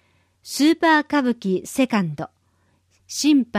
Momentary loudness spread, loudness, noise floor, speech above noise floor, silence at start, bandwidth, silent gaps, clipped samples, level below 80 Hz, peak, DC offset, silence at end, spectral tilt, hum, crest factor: 14 LU; -20 LUFS; -64 dBFS; 44 dB; 0.45 s; 15.5 kHz; none; under 0.1%; -64 dBFS; -6 dBFS; under 0.1%; 0 s; -4.5 dB/octave; none; 16 dB